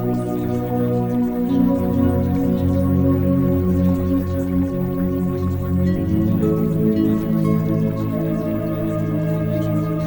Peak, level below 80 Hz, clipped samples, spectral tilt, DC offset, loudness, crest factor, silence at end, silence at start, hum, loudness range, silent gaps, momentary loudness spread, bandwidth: -4 dBFS; -40 dBFS; under 0.1%; -9.5 dB/octave; under 0.1%; -19 LUFS; 14 dB; 0 s; 0 s; none; 2 LU; none; 4 LU; 18 kHz